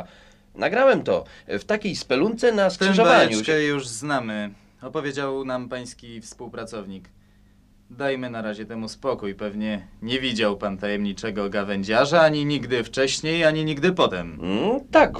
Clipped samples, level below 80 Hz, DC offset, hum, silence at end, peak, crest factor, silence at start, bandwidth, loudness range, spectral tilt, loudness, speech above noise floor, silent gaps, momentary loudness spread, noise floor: under 0.1%; -50 dBFS; under 0.1%; none; 0 s; -2 dBFS; 20 dB; 0 s; 12 kHz; 12 LU; -4.5 dB/octave; -22 LUFS; 32 dB; none; 16 LU; -55 dBFS